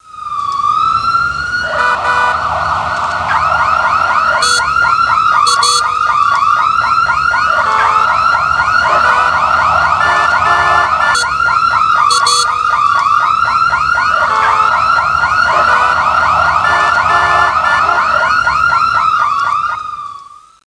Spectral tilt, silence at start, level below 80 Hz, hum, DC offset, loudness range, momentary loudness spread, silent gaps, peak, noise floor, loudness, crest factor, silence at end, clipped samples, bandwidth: -1.5 dB/octave; 0.1 s; -38 dBFS; none; under 0.1%; 2 LU; 5 LU; none; 0 dBFS; -35 dBFS; -10 LUFS; 12 dB; 0.35 s; under 0.1%; 10.5 kHz